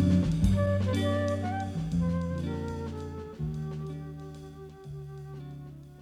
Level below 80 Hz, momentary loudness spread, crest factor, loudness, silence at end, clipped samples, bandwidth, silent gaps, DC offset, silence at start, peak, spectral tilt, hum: -42 dBFS; 18 LU; 18 dB; -31 LUFS; 0 s; under 0.1%; 12 kHz; none; under 0.1%; 0 s; -12 dBFS; -8 dB/octave; none